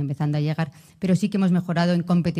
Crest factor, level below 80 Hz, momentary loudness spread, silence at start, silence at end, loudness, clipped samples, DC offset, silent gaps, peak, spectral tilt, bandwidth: 16 dB; -58 dBFS; 8 LU; 0 s; 0 s; -23 LUFS; under 0.1%; under 0.1%; none; -6 dBFS; -7.5 dB/octave; 10.5 kHz